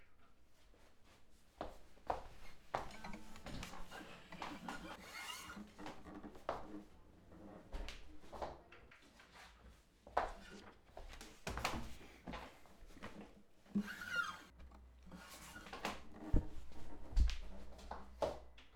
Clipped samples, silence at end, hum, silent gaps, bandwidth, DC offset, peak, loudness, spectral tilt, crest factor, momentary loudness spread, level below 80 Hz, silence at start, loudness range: under 0.1%; 0 s; none; none; 18.5 kHz; under 0.1%; -20 dBFS; -48 LUFS; -5 dB/octave; 26 dB; 19 LU; -50 dBFS; 0 s; 6 LU